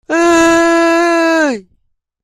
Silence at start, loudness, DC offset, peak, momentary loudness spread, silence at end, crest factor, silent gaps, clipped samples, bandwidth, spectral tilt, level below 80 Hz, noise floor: 0.1 s; -10 LUFS; under 0.1%; 0 dBFS; 6 LU; 0.65 s; 12 dB; none; under 0.1%; 14.5 kHz; -3 dB/octave; -46 dBFS; -60 dBFS